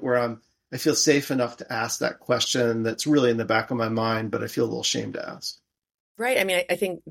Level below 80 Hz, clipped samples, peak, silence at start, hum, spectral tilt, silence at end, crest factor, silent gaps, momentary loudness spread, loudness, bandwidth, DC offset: -66 dBFS; under 0.1%; -6 dBFS; 0 s; none; -3.5 dB/octave; 0 s; 20 dB; 5.94-6.15 s; 11 LU; -24 LUFS; 16.5 kHz; under 0.1%